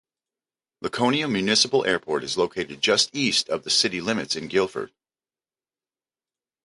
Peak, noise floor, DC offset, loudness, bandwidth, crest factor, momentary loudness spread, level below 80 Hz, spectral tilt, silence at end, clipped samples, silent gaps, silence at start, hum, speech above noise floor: -6 dBFS; under -90 dBFS; under 0.1%; -22 LUFS; 11.5 kHz; 20 dB; 9 LU; -62 dBFS; -2.5 dB/octave; 1.8 s; under 0.1%; none; 0.8 s; none; over 66 dB